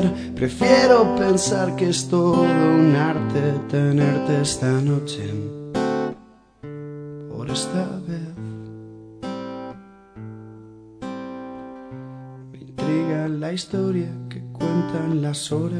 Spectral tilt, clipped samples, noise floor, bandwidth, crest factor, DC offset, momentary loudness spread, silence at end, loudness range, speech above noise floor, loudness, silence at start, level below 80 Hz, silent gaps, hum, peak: -6 dB/octave; under 0.1%; -48 dBFS; 11 kHz; 20 dB; under 0.1%; 22 LU; 0 s; 18 LU; 29 dB; -21 LUFS; 0 s; -52 dBFS; none; none; -2 dBFS